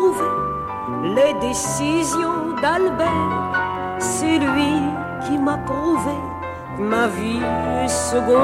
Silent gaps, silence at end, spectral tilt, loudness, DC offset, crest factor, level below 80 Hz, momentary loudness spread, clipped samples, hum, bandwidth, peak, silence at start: none; 0 s; -4.5 dB/octave; -20 LUFS; under 0.1%; 14 dB; -44 dBFS; 7 LU; under 0.1%; none; 16 kHz; -6 dBFS; 0 s